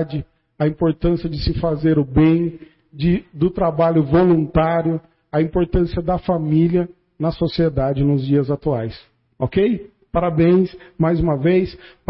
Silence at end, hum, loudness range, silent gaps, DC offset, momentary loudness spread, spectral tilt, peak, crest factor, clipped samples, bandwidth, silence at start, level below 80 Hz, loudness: 0.25 s; none; 2 LU; none; under 0.1%; 9 LU; -13 dB/octave; -4 dBFS; 14 dB; under 0.1%; 5.8 kHz; 0 s; -34 dBFS; -19 LUFS